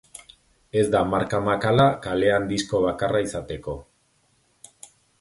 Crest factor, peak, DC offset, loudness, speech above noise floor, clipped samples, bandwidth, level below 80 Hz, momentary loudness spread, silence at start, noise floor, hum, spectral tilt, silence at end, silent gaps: 18 dB; -6 dBFS; under 0.1%; -23 LUFS; 43 dB; under 0.1%; 11.5 kHz; -48 dBFS; 15 LU; 0.75 s; -65 dBFS; none; -5.5 dB/octave; 1.4 s; none